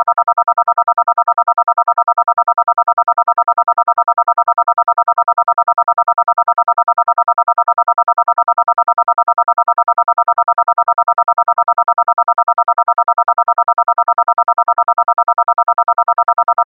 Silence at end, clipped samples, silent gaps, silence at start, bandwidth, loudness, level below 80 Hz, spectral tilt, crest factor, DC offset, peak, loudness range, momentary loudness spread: 0.05 s; under 0.1%; none; 0 s; 2.4 kHz; -13 LUFS; -72 dBFS; -6 dB/octave; 12 dB; under 0.1%; 0 dBFS; 0 LU; 0 LU